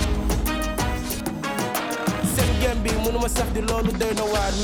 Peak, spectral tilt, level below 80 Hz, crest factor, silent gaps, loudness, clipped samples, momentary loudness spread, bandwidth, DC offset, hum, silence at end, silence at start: -10 dBFS; -4.5 dB/octave; -28 dBFS; 12 dB; none; -24 LUFS; under 0.1%; 5 LU; over 20 kHz; under 0.1%; none; 0 s; 0 s